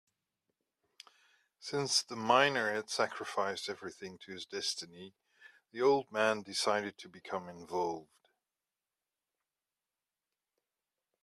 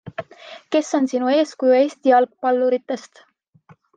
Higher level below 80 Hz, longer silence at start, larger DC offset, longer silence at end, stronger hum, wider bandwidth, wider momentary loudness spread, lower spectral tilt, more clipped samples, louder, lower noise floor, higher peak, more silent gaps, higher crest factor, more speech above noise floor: second, -82 dBFS vs -74 dBFS; first, 1.6 s vs 0.05 s; neither; first, 3.2 s vs 0.95 s; neither; first, 14.5 kHz vs 9.2 kHz; about the same, 18 LU vs 18 LU; second, -2.5 dB/octave vs -4.5 dB/octave; neither; second, -34 LUFS vs -19 LUFS; first, under -90 dBFS vs -53 dBFS; second, -12 dBFS vs -4 dBFS; neither; first, 26 dB vs 16 dB; first, over 55 dB vs 35 dB